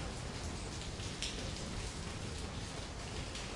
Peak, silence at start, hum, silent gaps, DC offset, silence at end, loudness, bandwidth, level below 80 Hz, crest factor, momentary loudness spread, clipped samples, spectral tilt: -18 dBFS; 0 s; none; none; under 0.1%; 0 s; -42 LUFS; 11.5 kHz; -48 dBFS; 24 dB; 4 LU; under 0.1%; -3.5 dB/octave